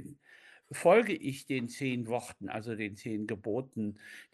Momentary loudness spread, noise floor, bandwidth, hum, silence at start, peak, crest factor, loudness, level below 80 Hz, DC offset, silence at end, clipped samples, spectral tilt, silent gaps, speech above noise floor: 15 LU; -59 dBFS; 12.5 kHz; none; 0 s; -10 dBFS; 22 dB; -33 LUFS; -76 dBFS; under 0.1%; 0.1 s; under 0.1%; -5.5 dB/octave; none; 26 dB